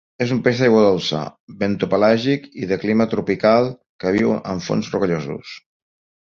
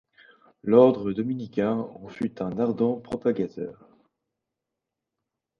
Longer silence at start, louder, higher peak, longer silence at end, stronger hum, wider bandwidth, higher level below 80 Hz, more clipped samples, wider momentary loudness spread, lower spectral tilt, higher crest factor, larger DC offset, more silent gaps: second, 0.2 s vs 0.65 s; first, -19 LUFS vs -25 LUFS; about the same, -2 dBFS vs -4 dBFS; second, 0.7 s vs 1.85 s; neither; about the same, 7.2 kHz vs 6.8 kHz; first, -52 dBFS vs -62 dBFS; neither; second, 11 LU vs 17 LU; second, -6.5 dB/octave vs -9 dB/octave; second, 16 dB vs 22 dB; neither; first, 1.40-1.47 s, 3.86-3.99 s vs none